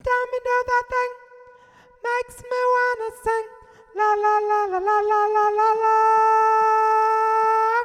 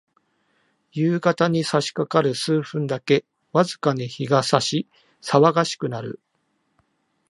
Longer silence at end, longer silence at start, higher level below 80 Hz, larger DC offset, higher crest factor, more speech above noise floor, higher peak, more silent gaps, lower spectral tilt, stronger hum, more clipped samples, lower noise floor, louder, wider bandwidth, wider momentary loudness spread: second, 0 s vs 1.15 s; second, 0.05 s vs 0.95 s; first, -54 dBFS vs -68 dBFS; neither; second, 12 dB vs 22 dB; second, 32 dB vs 50 dB; second, -10 dBFS vs -2 dBFS; neither; second, -3.5 dB/octave vs -5.5 dB/octave; neither; neither; second, -52 dBFS vs -70 dBFS; about the same, -20 LUFS vs -21 LUFS; first, 13 kHz vs 11.5 kHz; about the same, 10 LU vs 12 LU